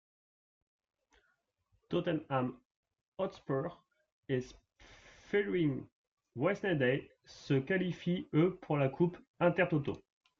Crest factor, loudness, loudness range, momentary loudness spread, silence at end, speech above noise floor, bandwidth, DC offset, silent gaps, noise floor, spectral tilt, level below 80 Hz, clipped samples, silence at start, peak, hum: 20 dB; -35 LUFS; 7 LU; 12 LU; 0.4 s; 46 dB; 7.2 kHz; under 0.1%; 2.65-2.70 s, 2.76-2.83 s, 3.08-3.12 s, 4.12-4.23 s, 5.92-6.17 s, 9.27-9.34 s; -79 dBFS; -8 dB/octave; -68 dBFS; under 0.1%; 1.9 s; -16 dBFS; none